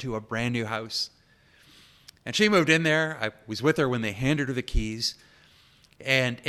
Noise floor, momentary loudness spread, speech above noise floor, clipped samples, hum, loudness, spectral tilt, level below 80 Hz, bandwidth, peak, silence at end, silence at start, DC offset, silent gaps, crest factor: -59 dBFS; 11 LU; 33 dB; under 0.1%; none; -26 LUFS; -4.5 dB/octave; -40 dBFS; 14.5 kHz; -6 dBFS; 0 s; 0 s; under 0.1%; none; 20 dB